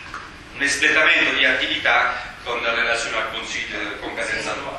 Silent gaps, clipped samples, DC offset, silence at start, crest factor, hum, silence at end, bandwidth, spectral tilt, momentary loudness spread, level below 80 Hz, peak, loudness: none; under 0.1%; under 0.1%; 0 s; 20 dB; none; 0 s; 12.5 kHz; -1.5 dB/octave; 13 LU; -48 dBFS; -2 dBFS; -19 LUFS